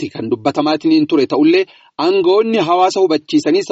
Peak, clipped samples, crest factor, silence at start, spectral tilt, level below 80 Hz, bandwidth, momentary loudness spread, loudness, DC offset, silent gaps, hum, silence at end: -2 dBFS; under 0.1%; 12 dB; 0 s; -4 dB/octave; -62 dBFS; 8 kHz; 6 LU; -14 LUFS; under 0.1%; none; none; 0 s